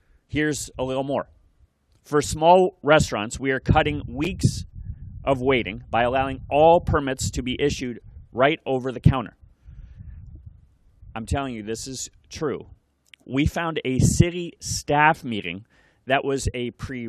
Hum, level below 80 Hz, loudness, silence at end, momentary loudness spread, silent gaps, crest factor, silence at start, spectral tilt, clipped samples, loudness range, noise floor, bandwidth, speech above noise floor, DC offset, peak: none; -40 dBFS; -23 LUFS; 0 s; 16 LU; none; 24 dB; 0.3 s; -5 dB/octave; under 0.1%; 9 LU; -60 dBFS; 14 kHz; 38 dB; under 0.1%; 0 dBFS